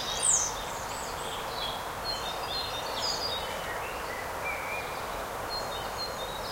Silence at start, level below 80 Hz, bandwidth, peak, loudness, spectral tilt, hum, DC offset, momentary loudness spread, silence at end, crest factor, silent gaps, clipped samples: 0 s; -50 dBFS; 16 kHz; -12 dBFS; -32 LUFS; -1 dB/octave; none; under 0.1%; 9 LU; 0 s; 22 dB; none; under 0.1%